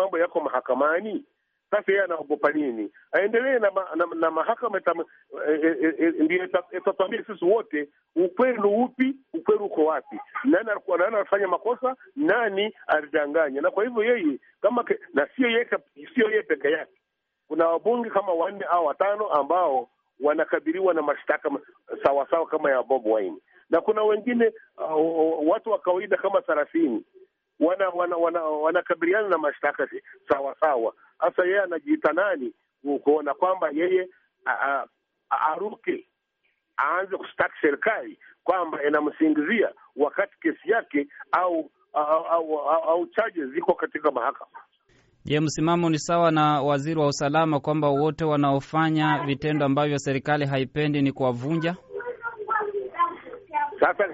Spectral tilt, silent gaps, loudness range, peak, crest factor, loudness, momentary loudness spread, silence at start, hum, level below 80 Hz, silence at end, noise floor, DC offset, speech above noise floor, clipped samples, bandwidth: -4.5 dB/octave; none; 3 LU; -8 dBFS; 16 dB; -24 LUFS; 8 LU; 0 s; none; -66 dBFS; 0 s; -74 dBFS; under 0.1%; 50 dB; under 0.1%; 7.6 kHz